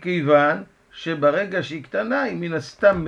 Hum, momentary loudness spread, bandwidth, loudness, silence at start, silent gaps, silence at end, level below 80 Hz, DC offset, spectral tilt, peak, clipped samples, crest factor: none; 12 LU; 7.6 kHz; -21 LUFS; 0 s; none; 0 s; -52 dBFS; under 0.1%; -6.5 dB/octave; -4 dBFS; under 0.1%; 18 dB